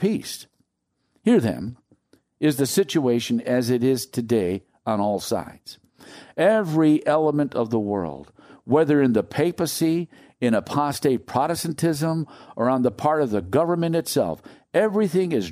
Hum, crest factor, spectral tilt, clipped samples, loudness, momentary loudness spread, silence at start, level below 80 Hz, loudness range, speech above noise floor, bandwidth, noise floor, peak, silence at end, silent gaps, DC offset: none; 18 dB; -6 dB/octave; under 0.1%; -22 LUFS; 10 LU; 0 s; -60 dBFS; 2 LU; 53 dB; 15.5 kHz; -74 dBFS; -6 dBFS; 0 s; none; under 0.1%